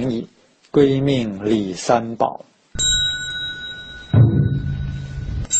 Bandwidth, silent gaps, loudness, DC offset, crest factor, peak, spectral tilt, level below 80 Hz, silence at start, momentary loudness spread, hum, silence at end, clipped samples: 8.8 kHz; none; -19 LUFS; under 0.1%; 16 dB; -2 dBFS; -4.5 dB/octave; -36 dBFS; 0 s; 14 LU; none; 0 s; under 0.1%